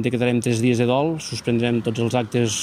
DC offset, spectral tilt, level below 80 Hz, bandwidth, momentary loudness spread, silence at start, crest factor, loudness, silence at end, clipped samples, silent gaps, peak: under 0.1%; -5.5 dB/octave; -56 dBFS; 15.5 kHz; 4 LU; 0 s; 16 dB; -21 LUFS; 0 s; under 0.1%; none; -6 dBFS